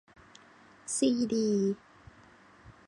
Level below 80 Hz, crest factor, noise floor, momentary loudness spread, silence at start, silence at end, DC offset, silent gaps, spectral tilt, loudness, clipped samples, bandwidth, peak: -66 dBFS; 18 dB; -58 dBFS; 13 LU; 0.85 s; 0.15 s; under 0.1%; none; -5 dB/octave; -30 LUFS; under 0.1%; 11.5 kHz; -16 dBFS